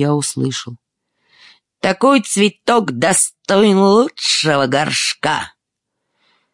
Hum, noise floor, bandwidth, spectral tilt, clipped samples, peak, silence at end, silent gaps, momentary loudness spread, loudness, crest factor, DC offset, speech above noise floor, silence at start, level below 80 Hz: none; -77 dBFS; 11.5 kHz; -3.5 dB/octave; under 0.1%; -2 dBFS; 1.05 s; none; 9 LU; -15 LUFS; 14 dB; under 0.1%; 62 dB; 0 s; -62 dBFS